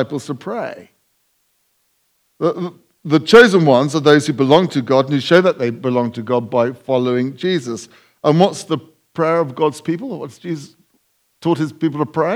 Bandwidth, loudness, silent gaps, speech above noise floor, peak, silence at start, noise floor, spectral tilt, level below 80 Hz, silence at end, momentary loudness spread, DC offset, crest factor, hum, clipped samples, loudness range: 13.5 kHz; -16 LUFS; none; 48 dB; 0 dBFS; 0 s; -64 dBFS; -6 dB/octave; -60 dBFS; 0 s; 15 LU; under 0.1%; 16 dB; none; 0.1%; 8 LU